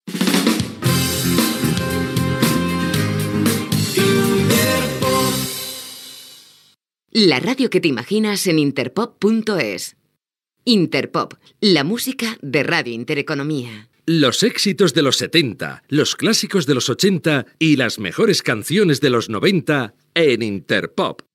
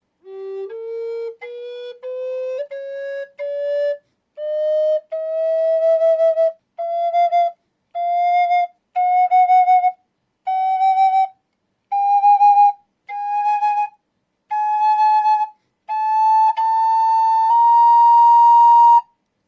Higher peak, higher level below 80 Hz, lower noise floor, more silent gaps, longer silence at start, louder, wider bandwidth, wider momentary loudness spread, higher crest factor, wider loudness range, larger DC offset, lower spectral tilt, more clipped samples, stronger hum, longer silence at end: first, 0 dBFS vs -6 dBFS; first, -50 dBFS vs -88 dBFS; first, -76 dBFS vs -71 dBFS; neither; second, 0.05 s vs 0.25 s; about the same, -18 LUFS vs -16 LUFS; first, 17 kHz vs 7 kHz; second, 8 LU vs 18 LU; first, 18 dB vs 10 dB; second, 3 LU vs 12 LU; neither; first, -4.5 dB/octave vs -1.5 dB/octave; neither; neither; second, 0.2 s vs 0.45 s